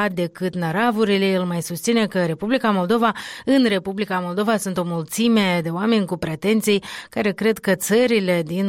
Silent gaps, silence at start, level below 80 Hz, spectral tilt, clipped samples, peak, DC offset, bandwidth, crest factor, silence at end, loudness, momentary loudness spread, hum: none; 0 s; -58 dBFS; -5 dB/octave; under 0.1%; -8 dBFS; under 0.1%; 16.5 kHz; 12 dB; 0 s; -20 LUFS; 7 LU; none